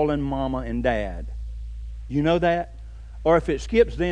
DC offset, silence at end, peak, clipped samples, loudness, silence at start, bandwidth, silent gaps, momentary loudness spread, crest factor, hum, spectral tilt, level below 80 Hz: 0.1%; 0 s; -6 dBFS; under 0.1%; -23 LUFS; 0 s; 10 kHz; none; 16 LU; 18 dB; none; -7 dB/octave; -34 dBFS